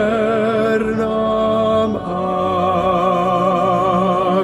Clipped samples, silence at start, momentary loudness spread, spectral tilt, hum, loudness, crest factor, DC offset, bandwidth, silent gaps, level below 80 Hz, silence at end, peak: under 0.1%; 0 s; 3 LU; -7 dB/octave; none; -17 LUFS; 12 dB; under 0.1%; 12.5 kHz; none; -44 dBFS; 0 s; -4 dBFS